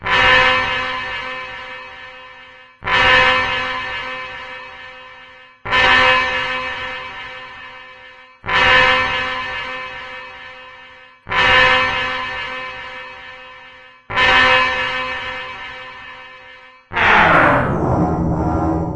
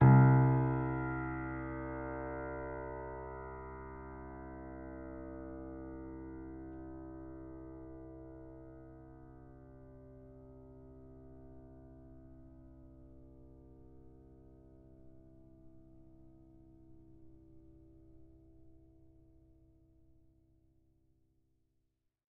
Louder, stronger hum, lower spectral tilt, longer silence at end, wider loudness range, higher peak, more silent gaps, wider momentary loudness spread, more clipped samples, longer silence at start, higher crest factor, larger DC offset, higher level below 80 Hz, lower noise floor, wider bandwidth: first, -15 LUFS vs -37 LUFS; neither; second, -4.5 dB/octave vs -11 dB/octave; second, 0 s vs 3.55 s; second, 1 LU vs 20 LU; first, 0 dBFS vs -14 dBFS; neither; about the same, 23 LU vs 23 LU; neither; about the same, 0 s vs 0 s; second, 18 dB vs 24 dB; neither; first, -38 dBFS vs -56 dBFS; second, -42 dBFS vs -81 dBFS; first, 10.5 kHz vs 2.7 kHz